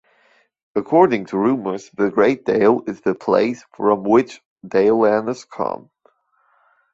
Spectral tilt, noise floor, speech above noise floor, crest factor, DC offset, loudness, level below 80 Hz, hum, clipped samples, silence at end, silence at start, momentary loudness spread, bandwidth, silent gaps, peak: -7 dB/octave; -62 dBFS; 44 dB; 18 dB; under 0.1%; -18 LUFS; -60 dBFS; none; under 0.1%; 1.2 s; 0.75 s; 11 LU; 7.8 kHz; 4.46-4.56 s; -2 dBFS